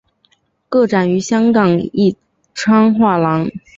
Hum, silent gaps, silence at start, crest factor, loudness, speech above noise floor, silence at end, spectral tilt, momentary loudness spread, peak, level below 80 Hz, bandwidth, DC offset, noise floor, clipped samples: none; none; 0.7 s; 12 dB; -14 LUFS; 47 dB; 0.2 s; -6.5 dB/octave; 8 LU; -2 dBFS; -52 dBFS; 7.8 kHz; under 0.1%; -59 dBFS; under 0.1%